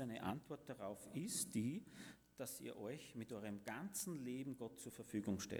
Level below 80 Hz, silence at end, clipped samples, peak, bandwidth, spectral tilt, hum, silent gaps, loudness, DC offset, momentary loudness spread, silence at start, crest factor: -78 dBFS; 0 s; under 0.1%; -30 dBFS; over 20 kHz; -4.5 dB/octave; none; none; -48 LUFS; under 0.1%; 10 LU; 0 s; 18 dB